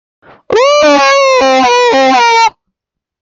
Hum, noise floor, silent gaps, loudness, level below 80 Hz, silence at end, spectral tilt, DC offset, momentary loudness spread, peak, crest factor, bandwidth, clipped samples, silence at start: none; -79 dBFS; none; -7 LUFS; -50 dBFS; 0.7 s; -1.5 dB/octave; under 0.1%; 4 LU; 0 dBFS; 8 dB; 7.8 kHz; under 0.1%; 0.5 s